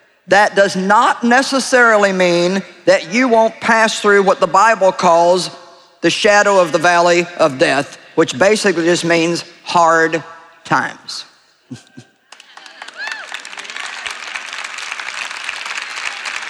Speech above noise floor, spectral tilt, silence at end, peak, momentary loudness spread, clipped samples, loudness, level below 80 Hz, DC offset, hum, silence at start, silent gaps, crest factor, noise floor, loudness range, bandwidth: 31 dB; -3.5 dB/octave; 0 s; 0 dBFS; 14 LU; under 0.1%; -14 LUFS; -60 dBFS; under 0.1%; none; 0.3 s; none; 14 dB; -44 dBFS; 13 LU; 13 kHz